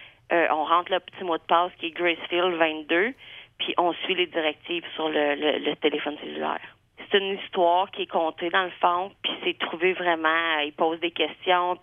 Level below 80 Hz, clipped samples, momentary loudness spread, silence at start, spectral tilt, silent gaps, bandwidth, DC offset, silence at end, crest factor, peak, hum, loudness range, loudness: -70 dBFS; under 0.1%; 8 LU; 0 s; -6.5 dB/octave; none; 3.8 kHz; under 0.1%; 0.05 s; 20 dB; -6 dBFS; none; 2 LU; -25 LUFS